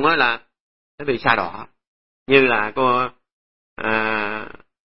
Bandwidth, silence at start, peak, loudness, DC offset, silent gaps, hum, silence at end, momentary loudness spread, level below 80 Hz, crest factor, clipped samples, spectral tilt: 5.8 kHz; 0 s; 0 dBFS; -19 LUFS; 1%; 0.60-0.98 s, 1.87-2.26 s, 3.32-3.76 s; none; 0.15 s; 15 LU; -54 dBFS; 22 dB; under 0.1%; -8.5 dB/octave